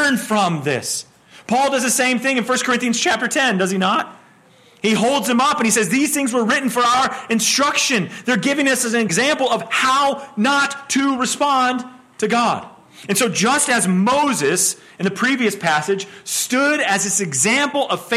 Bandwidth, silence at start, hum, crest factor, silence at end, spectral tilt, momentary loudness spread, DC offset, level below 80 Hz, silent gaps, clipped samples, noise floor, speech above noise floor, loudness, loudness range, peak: 16 kHz; 0 s; none; 14 dB; 0 s; -3 dB/octave; 6 LU; under 0.1%; -62 dBFS; none; under 0.1%; -50 dBFS; 32 dB; -17 LUFS; 2 LU; -4 dBFS